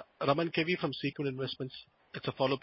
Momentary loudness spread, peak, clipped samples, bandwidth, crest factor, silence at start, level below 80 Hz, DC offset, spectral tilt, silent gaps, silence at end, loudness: 12 LU; -12 dBFS; under 0.1%; 5.8 kHz; 22 dB; 0 s; -70 dBFS; under 0.1%; -9.5 dB/octave; none; 0.05 s; -34 LUFS